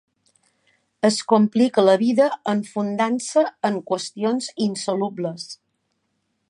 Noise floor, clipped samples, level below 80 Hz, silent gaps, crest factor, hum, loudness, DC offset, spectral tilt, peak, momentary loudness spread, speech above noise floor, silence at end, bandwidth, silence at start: -72 dBFS; under 0.1%; -72 dBFS; none; 20 dB; none; -21 LUFS; under 0.1%; -5 dB/octave; -2 dBFS; 11 LU; 52 dB; 0.95 s; 11 kHz; 1.05 s